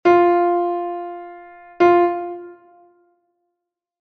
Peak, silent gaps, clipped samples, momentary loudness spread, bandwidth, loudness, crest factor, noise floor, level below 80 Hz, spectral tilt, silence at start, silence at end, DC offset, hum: -4 dBFS; none; under 0.1%; 21 LU; 6.2 kHz; -18 LUFS; 16 dB; -80 dBFS; -62 dBFS; -7 dB/octave; 0.05 s; 1.5 s; under 0.1%; none